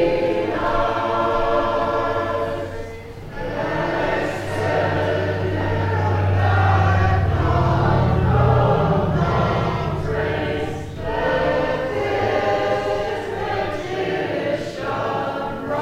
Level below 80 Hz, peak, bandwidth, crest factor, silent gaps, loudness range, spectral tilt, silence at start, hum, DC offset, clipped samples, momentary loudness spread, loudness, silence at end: -34 dBFS; -4 dBFS; 10 kHz; 16 dB; none; 5 LU; -7.5 dB/octave; 0 s; none; 0.1%; under 0.1%; 8 LU; -21 LUFS; 0 s